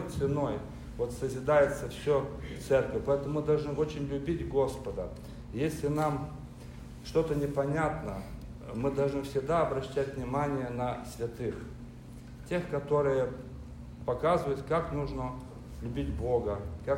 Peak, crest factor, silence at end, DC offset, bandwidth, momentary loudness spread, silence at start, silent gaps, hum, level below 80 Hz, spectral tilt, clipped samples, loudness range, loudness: -14 dBFS; 18 dB; 0 s; under 0.1%; 16 kHz; 16 LU; 0 s; none; none; -46 dBFS; -7 dB/octave; under 0.1%; 4 LU; -32 LUFS